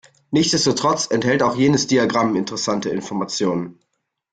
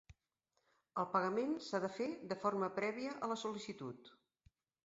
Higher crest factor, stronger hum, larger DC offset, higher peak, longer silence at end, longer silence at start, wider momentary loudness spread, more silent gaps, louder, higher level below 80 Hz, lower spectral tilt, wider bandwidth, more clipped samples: about the same, 16 dB vs 20 dB; neither; neither; first, -4 dBFS vs -22 dBFS; second, 0.6 s vs 0.75 s; first, 0.3 s vs 0.1 s; second, 8 LU vs 11 LU; neither; first, -19 LUFS vs -41 LUFS; first, -56 dBFS vs -78 dBFS; about the same, -4 dB/octave vs -4 dB/octave; first, 9.4 kHz vs 7.6 kHz; neither